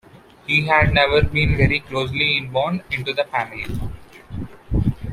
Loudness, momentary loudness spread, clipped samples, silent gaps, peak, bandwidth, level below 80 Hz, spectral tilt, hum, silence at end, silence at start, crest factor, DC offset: -19 LUFS; 18 LU; under 0.1%; none; -2 dBFS; 14.5 kHz; -32 dBFS; -6.5 dB/octave; none; 0 s; 0.15 s; 18 dB; under 0.1%